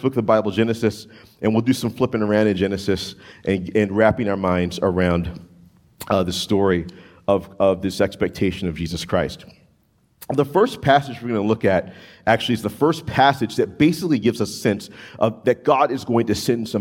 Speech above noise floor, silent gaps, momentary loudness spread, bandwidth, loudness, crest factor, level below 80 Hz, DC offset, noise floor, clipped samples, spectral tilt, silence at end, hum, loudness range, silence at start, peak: 41 dB; none; 8 LU; 17.5 kHz; -20 LUFS; 20 dB; -50 dBFS; under 0.1%; -61 dBFS; under 0.1%; -6 dB/octave; 0 s; none; 3 LU; 0 s; 0 dBFS